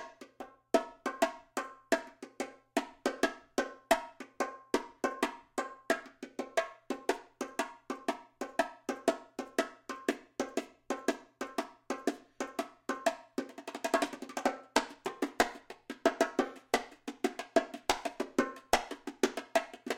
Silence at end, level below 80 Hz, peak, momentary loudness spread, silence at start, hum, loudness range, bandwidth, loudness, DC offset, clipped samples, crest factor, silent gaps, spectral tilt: 0 s; -64 dBFS; -8 dBFS; 10 LU; 0 s; none; 4 LU; 16.5 kHz; -36 LUFS; under 0.1%; under 0.1%; 28 dB; none; -2 dB/octave